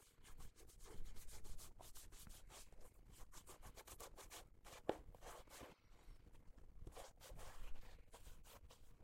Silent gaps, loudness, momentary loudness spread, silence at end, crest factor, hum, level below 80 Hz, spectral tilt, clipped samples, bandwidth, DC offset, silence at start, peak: none; -60 LUFS; 11 LU; 0 s; 32 dB; none; -60 dBFS; -3.5 dB/octave; under 0.1%; 16.5 kHz; under 0.1%; 0 s; -22 dBFS